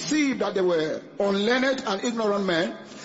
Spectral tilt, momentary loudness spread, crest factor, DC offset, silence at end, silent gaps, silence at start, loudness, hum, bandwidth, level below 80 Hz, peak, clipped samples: -4 dB/octave; 5 LU; 16 dB; under 0.1%; 0 s; none; 0 s; -25 LUFS; none; 8 kHz; -66 dBFS; -8 dBFS; under 0.1%